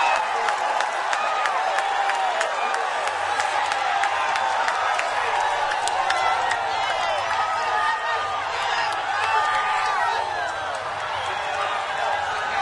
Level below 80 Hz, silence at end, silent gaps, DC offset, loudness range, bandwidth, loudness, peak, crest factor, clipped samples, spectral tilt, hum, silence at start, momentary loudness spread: -60 dBFS; 0 s; none; under 0.1%; 1 LU; 11.5 kHz; -23 LUFS; -2 dBFS; 22 dB; under 0.1%; -0.5 dB/octave; none; 0 s; 4 LU